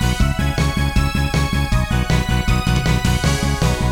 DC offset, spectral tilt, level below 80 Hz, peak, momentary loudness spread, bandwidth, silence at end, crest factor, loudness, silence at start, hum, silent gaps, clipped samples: under 0.1%; -5 dB/octave; -22 dBFS; -2 dBFS; 1 LU; 18 kHz; 0 s; 14 dB; -18 LUFS; 0 s; none; none; under 0.1%